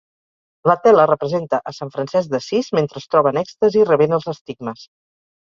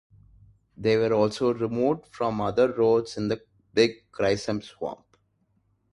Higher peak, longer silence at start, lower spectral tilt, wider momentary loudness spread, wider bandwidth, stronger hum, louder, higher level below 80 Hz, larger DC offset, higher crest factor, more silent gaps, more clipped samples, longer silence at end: first, 0 dBFS vs -6 dBFS; second, 0.65 s vs 0.8 s; about the same, -6.5 dB/octave vs -6 dB/octave; first, 15 LU vs 11 LU; second, 7.4 kHz vs 11.5 kHz; neither; first, -17 LUFS vs -26 LUFS; about the same, -62 dBFS vs -58 dBFS; neither; about the same, 18 dB vs 20 dB; first, 4.41-4.45 s vs none; neither; second, 0.65 s vs 1 s